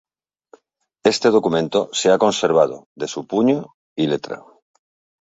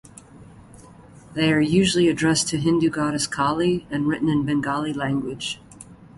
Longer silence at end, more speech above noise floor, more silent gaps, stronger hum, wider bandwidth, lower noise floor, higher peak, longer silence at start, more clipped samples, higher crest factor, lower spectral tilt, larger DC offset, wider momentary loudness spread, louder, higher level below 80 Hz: first, 0.8 s vs 0.15 s; first, 43 dB vs 25 dB; first, 2.86-2.96 s, 3.74-3.96 s vs none; neither; second, 8 kHz vs 11.5 kHz; first, -62 dBFS vs -46 dBFS; first, -2 dBFS vs -6 dBFS; first, 1.05 s vs 0.35 s; neither; about the same, 18 dB vs 16 dB; about the same, -4.5 dB/octave vs -4.5 dB/octave; neither; first, 13 LU vs 9 LU; first, -19 LUFS vs -22 LUFS; second, -62 dBFS vs -52 dBFS